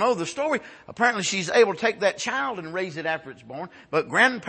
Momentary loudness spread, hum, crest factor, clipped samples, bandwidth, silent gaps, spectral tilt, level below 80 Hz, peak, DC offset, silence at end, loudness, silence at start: 17 LU; none; 20 dB; under 0.1%; 8.8 kHz; none; -3 dB/octave; -68 dBFS; -4 dBFS; under 0.1%; 0 s; -24 LUFS; 0 s